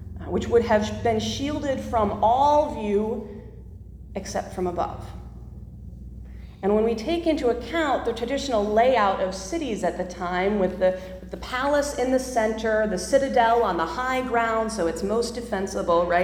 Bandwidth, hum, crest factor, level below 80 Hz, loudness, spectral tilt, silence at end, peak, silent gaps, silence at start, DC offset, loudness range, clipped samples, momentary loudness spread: 17.5 kHz; none; 18 dB; -42 dBFS; -24 LUFS; -5 dB/octave; 0 s; -6 dBFS; none; 0 s; under 0.1%; 6 LU; under 0.1%; 21 LU